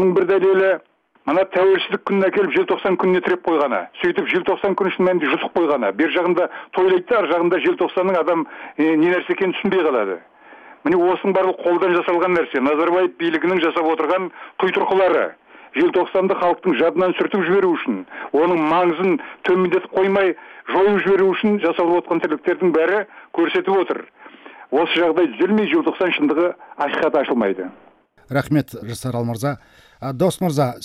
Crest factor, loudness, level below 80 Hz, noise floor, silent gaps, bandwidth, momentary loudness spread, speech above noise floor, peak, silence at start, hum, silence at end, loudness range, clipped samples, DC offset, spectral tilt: 12 dB; -18 LUFS; -60 dBFS; -44 dBFS; none; 13.5 kHz; 7 LU; 26 dB; -6 dBFS; 0 s; none; 0 s; 2 LU; under 0.1%; under 0.1%; -6.5 dB/octave